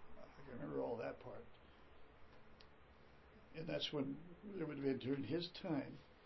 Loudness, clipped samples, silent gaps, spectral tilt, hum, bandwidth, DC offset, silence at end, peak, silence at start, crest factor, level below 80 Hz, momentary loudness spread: -46 LUFS; under 0.1%; none; -4.5 dB/octave; none; 5.8 kHz; under 0.1%; 0 s; -28 dBFS; 0 s; 20 dB; -70 dBFS; 23 LU